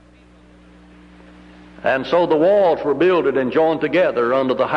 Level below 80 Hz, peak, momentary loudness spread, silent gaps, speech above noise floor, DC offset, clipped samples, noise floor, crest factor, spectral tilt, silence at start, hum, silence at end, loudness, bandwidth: -52 dBFS; -6 dBFS; 4 LU; none; 31 dB; under 0.1%; under 0.1%; -48 dBFS; 12 dB; -7 dB/octave; 1.8 s; 60 Hz at -50 dBFS; 0 s; -17 LUFS; 7.2 kHz